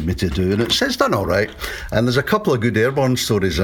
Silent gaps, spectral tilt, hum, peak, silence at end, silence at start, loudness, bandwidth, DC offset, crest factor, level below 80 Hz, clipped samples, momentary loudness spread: none; -5 dB/octave; none; -2 dBFS; 0 s; 0 s; -18 LUFS; 18 kHz; under 0.1%; 18 dB; -36 dBFS; under 0.1%; 4 LU